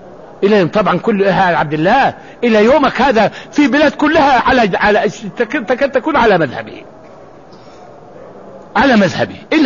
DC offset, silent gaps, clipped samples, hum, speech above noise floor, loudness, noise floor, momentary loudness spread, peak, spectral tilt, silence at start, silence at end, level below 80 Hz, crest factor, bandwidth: 0.4%; none; under 0.1%; none; 26 dB; -12 LUFS; -37 dBFS; 8 LU; -2 dBFS; -6 dB/octave; 0 s; 0 s; -42 dBFS; 12 dB; 7.4 kHz